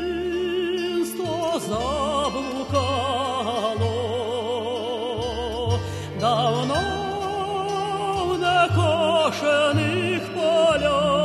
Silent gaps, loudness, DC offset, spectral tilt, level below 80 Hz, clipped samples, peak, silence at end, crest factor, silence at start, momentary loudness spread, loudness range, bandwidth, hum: none; -23 LUFS; under 0.1%; -5 dB/octave; -44 dBFS; under 0.1%; -8 dBFS; 0 s; 14 dB; 0 s; 7 LU; 4 LU; 13 kHz; none